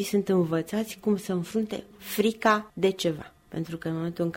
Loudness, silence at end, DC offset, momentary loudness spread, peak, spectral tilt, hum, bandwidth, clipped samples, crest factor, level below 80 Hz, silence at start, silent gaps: -28 LUFS; 0 s; under 0.1%; 11 LU; -8 dBFS; -5.5 dB/octave; none; 16.5 kHz; under 0.1%; 18 dB; -62 dBFS; 0 s; none